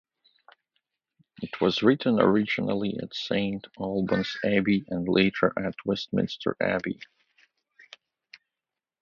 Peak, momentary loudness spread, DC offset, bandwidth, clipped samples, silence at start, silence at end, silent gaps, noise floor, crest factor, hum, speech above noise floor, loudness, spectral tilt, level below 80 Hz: -6 dBFS; 10 LU; under 0.1%; 7 kHz; under 0.1%; 1.4 s; 2 s; none; -89 dBFS; 22 dB; none; 64 dB; -26 LUFS; -7 dB/octave; -60 dBFS